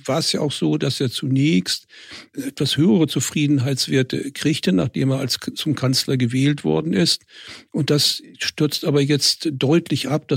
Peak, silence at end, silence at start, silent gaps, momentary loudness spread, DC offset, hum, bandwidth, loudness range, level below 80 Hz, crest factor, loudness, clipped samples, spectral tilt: -4 dBFS; 0 s; 0.05 s; none; 8 LU; under 0.1%; none; 16.5 kHz; 1 LU; -60 dBFS; 16 dB; -20 LUFS; under 0.1%; -5 dB/octave